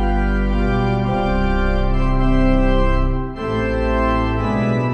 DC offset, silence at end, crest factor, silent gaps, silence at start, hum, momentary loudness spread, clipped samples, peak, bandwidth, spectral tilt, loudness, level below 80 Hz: under 0.1%; 0 s; 12 dB; none; 0 s; none; 4 LU; under 0.1%; -4 dBFS; 6.6 kHz; -8.5 dB/octave; -19 LUFS; -20 dBFS